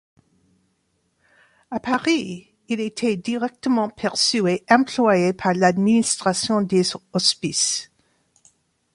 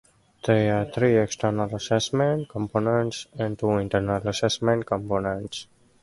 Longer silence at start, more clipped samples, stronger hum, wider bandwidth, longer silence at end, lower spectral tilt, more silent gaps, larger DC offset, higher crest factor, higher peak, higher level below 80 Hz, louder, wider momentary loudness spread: first, 1.7 s vs 0.45 s; neither; neither; about the same, 11.5 kHz vs 11.5 kHz; first, 1.1 s vs 0.4 s; second, -3.5 dB/octave vs -5.5 dB/octave; neither; neither; about the same, 20 dB vs 18 dB; first, -2 dBFS vs -6 dBFS; second, -62 dBFS vs -52 dBFS; first, -20 LUFS vs -25 LUFS; about the same, 9 LU vs 9 LU